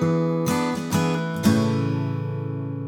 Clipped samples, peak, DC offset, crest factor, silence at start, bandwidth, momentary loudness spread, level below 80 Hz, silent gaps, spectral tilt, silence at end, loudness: under 0.1%; -6 dBFS; under 0.1%; 16 dB; 0 s; 18.5 kHz; 8 LU; -58 dBFS; none; -6.5 dB/octave; 0 s; -23 LUFS